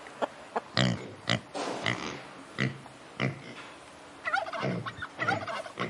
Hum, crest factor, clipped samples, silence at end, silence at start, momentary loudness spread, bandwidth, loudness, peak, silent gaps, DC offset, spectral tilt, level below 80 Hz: none; 26 dB; under 0.1%; 0 s; 0 s; 15 LU; 11.5 kHz; -33 LUFS; -8 dBFS; none; under 0.1%; -4.5 dB/octave; -64 dBFS